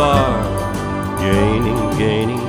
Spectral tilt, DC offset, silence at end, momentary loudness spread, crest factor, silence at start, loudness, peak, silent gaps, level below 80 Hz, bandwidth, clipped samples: -6.5 dB/octave; under 0.1%; 0 s; 6 LU; 16 dB; 0 s; -17 LUFS; -2 dBFS; none; -30 dBFS; 17 kHz; under 0.1%